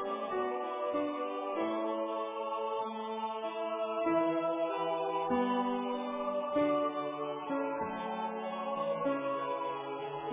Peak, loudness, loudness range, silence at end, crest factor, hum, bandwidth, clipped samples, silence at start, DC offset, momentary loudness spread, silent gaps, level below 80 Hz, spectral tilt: -20 dBFS; -35 LUFS; 3 LU; 0 s; 16 dB; none; 3.8 kHz; under 0.1%; 0 s; under 0.1%; 6 LU; none; -74 dBFS; -3.5 dB/octave